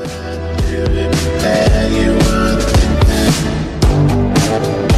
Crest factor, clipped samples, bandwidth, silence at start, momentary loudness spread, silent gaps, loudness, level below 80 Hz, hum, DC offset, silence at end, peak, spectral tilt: 12 dB; under 0.1%; 14 kHz; 0 s; 6 LU; none; -14 LUFS; -18 dBFS; none; under 0.1%; 0 s; -2 dBFS; -5.5 dB/octave